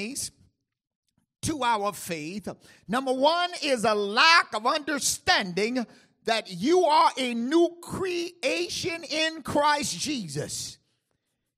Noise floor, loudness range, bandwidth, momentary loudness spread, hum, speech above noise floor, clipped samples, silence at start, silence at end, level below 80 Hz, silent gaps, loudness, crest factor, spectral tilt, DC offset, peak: -78 dBFS; 5 LU; 15.5 kHz; 13 LU; none; 52 dB; under 0.1%; 0 s; 0.85 s; -62 dBFS; 0.95-1.03 s; -25 LUFS; 22 dB; -2.5 dB/octave; under 0.1%; -6 dBFS